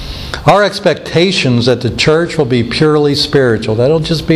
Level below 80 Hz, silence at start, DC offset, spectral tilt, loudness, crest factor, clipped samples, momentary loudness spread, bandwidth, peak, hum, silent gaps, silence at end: -34 dBFS; 0 s; under 0.1%; -5.5 dB/octave; -11 LUFS; 12 dB; under 0.1%; 3 LU; 13.5 kHz; 0 dBFS; none; none; 0 s